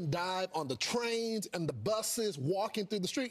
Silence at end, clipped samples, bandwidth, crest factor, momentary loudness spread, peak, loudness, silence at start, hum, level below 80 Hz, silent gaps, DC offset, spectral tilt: 0 s; under 0.1%; 14.5 kHz; 14 dB; 4 LU; -22 dBFS; -35 LUFS; 0 s; none; -72 dBFS; none; under 0.1%; -4 dB/octave